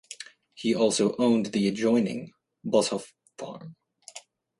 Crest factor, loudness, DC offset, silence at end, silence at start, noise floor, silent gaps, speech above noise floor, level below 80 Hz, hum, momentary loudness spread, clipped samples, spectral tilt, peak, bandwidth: 18 dB; -25 LUFS; under 0.1%; 0.4 s; 0.1 s; -50 dBFS; none; 25 dB; -70 dBFS; none; 21 LU; under 0.1%; -4.5 dB/octave; -10 dBFS; 11.5 kHz